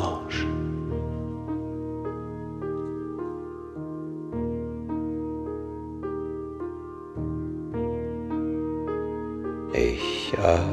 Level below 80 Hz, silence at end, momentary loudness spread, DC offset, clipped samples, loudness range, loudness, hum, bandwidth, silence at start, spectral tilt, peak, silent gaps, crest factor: -42 dBFS; 0 s; 10 LU; under 0.1%; under 0.1%; 4 LU; -31 LUFS; none; 10 kHz; 0 s; -6.5 dB/octave; -6 dBFS; none; 24 dB